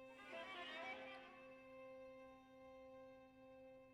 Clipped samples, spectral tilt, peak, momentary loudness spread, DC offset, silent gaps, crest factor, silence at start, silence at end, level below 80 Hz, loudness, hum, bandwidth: under 0.1%; -3.5 dB/octave; -40 dBFS; 12 LU; under 0.1%; none; 18 dB; 0 s; 0 s; -84 dBFS; -57 LUFS; none; 13 kHz